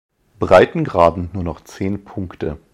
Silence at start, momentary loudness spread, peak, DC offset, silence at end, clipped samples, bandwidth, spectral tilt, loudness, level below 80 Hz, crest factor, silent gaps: 0.4 s; 15 LU; 0 dBFS; under 0.1%; 0.15 s; under 0.1%; 12 kHz; -7 dB/octave; -17 LUFS; -40 dBFS; 18 dB; none